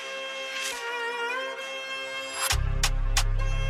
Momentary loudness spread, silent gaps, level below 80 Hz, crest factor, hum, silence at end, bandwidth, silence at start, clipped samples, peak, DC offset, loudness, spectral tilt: 7 LU; none; -30 dBFS; 18 dB; none; 0 s; 15 kHz; 0 s; under 0.1%; -10 dBFS; under 0.1%; -29 LUFS; -2 dB/octave